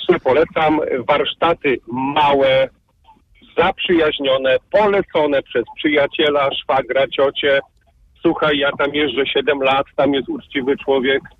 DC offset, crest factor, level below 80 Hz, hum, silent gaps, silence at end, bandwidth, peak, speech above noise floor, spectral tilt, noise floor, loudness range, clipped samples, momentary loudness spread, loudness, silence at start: under 0.1%; 16 dB; -48 dBFS; none; none; 0.1 s; 6 kHz; 0 dBFS; 37 dB; -6.5 dB/octave; -53 dBFS; 1 LU; under 0.1%; 5 LU; -17 LUFS; 0 s